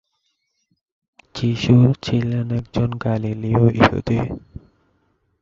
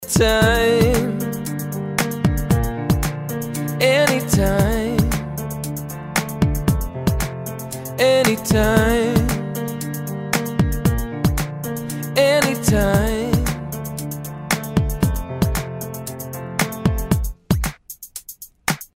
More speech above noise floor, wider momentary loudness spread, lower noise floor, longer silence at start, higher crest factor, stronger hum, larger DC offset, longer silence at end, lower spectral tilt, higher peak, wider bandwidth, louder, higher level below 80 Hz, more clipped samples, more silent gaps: first, 53 dB vs 25 dB; second, 10 LU vs 13 LU; first, -71 dBFS vs -40 dBFS; first, 1.35 s vs 0 s; about the same, 20 dB vs 18 dB; neither; neither; first, 1.05 s vs 0.1 s; first, -8 dB/octave vs -5 dB/octave; about the same, 0 dBFS vs -2 dBFS; second, 7.4 kHz vs 16.5 kHz; about the same, -19 LUFS vs -20 LUFS; second, -42 dBFS vs -30 dBFS; neither; neither